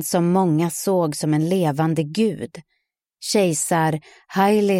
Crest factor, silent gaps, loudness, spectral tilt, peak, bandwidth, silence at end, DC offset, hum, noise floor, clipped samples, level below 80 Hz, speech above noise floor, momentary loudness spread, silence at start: 14 dB; none; -20 LUFS; -5.5 dB/octave; -6 dBFS; 16.5 kHz; 0 s; under 0.1%; none; -69 dBFS; under 0.1%; -66 dBFS; 49 dB; 10 LU; 0 s